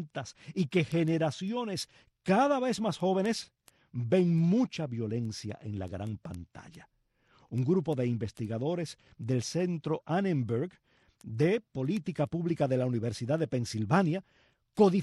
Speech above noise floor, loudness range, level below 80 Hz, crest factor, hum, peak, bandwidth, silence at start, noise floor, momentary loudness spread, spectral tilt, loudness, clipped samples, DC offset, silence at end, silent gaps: 36 dB; 5 LU; -66 dBFS; 18 dB; none; -12 dBFS; 12.5 kHz; 0 s; -66 dBFS; 14 LU; -7 dB/octave; -31 LUFS; under 0.1%; under 0.1%; 0 s; none